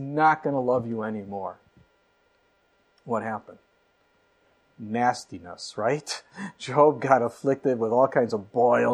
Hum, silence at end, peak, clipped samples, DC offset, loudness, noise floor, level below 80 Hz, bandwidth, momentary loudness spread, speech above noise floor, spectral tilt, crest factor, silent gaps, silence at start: none; 0 s; -4 dBFS; under 0.1%; under 0.1%; -25 LUFS; -66 dBFS; -72 dBFS; 12 kHz; 16 LU; 42 dB; -6 dB/octave; 22 dB; none; 0 s